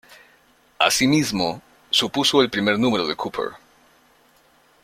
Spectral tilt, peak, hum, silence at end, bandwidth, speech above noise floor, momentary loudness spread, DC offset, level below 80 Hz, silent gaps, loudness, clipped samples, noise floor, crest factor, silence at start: -3.5 dB/octave; -2 dBFS; none; 1.3 s; 16.5 kHz; 37 dB; 10 LU; under 0.1%; -58 dBFS; none; -20 LUFS; under 0.1%; -57 dBFS; 22 dB; 0.1 s